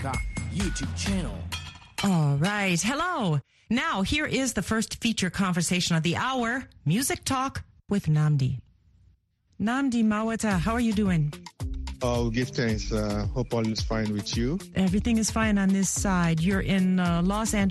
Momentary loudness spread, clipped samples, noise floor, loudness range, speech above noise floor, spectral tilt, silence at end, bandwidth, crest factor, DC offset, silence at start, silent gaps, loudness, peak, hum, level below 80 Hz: 7 LU; under 0.1%; -64 dBFS; 3 LU; 39 dB; -5 dB/octave; 0 s; 12.5 kHz; 16 dB; under 0.1%; 0 s; none; -26 LUFS; -10 dBFS; none; -40 dBFS